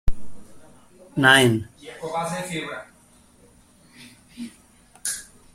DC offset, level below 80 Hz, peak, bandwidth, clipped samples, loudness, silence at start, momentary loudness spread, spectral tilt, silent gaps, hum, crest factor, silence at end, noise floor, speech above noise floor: under 0.1%; -38 dBFS; -2 dBFS; 16 kHz; under 0.1%; -22 LUFS; 0.05 s; 24 LU; -3.5 dB/octave; none; none; 24 dB; 0.3 s; -55 dBFS; 34 dB